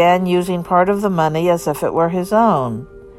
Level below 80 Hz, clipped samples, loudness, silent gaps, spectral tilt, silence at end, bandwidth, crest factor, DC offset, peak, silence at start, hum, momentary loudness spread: -46 dBFS; under 0.1%; -16 LUFS; none; -6.5 dB/octave; 0.05 s; 16 kHz; 14 dB; under 0.1%; -2 dBFS; 0 s; none; 5 LU